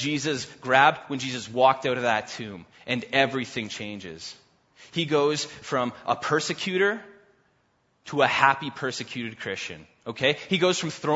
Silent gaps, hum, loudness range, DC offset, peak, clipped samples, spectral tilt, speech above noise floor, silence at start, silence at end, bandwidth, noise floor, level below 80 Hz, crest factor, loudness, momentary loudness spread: none; none; 4 LU; under 0.1%; -2 dBFS; under 0.1%; -4 dB/octave; 43 dB; 0 s; 0 s; 8 kHz; -68 dBFS; -66 dBFS; 24 dB; -25 LUFS; 16 LU